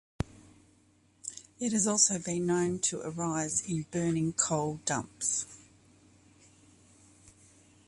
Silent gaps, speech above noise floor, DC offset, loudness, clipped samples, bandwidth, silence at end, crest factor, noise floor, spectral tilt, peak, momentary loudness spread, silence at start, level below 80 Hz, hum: none; 34 dB; under 0.1%; -30 LUFS; under 0.1%; 11.5 kHz; 2.3 s; 24 dB; -65 dBFS; -3.5 dB/octave; -10 dBFS; 15 LU; 0.2 s; -60 dBFS; none